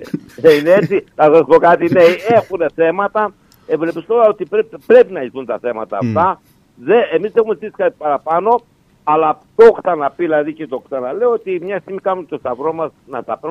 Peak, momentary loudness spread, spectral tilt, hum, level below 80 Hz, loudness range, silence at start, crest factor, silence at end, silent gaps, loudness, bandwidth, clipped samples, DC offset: 0 dBFS; 14 LU; -7 dB/octave; none; -56 dBFS; 5 LU; 0 s; 14 dB; 0 s; none; -14 LUFS; 12.5 kHz; under 0.1%; under 0.1%